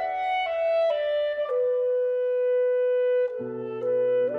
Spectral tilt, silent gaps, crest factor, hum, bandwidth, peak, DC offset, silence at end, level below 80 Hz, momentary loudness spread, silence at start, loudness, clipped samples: -6 dB/octave; none; 8 dB; none; 4.9 kHz; -16 dBFS; under 0.1%; 0 s; -70 dBFS; 4 LU; 0 s; -25 LUFS; under 0.1%